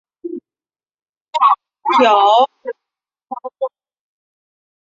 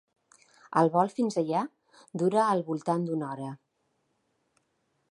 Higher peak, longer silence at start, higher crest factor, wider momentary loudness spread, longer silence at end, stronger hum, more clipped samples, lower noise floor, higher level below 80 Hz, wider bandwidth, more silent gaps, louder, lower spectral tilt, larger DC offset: first, 0 dBFS vs -10 dBFS; second, 0.25 s vs 0.7 s; about the same, 18 dB vs 20 dB; first, 20 LU vs 15 LU; second, 1.15 s vs 1.55 s; neither; neither; first, under -90 dBFS vs -76 dBFS; first, -74 dBFS vs -80 dBFS; second, 7.8 kHz vs 11.5 kHz; first, 1.09-1.25 s vs none; first, -15 LUFS vs -28 LUFS; second, -3 dB/octave vs -7 dB/octave; neither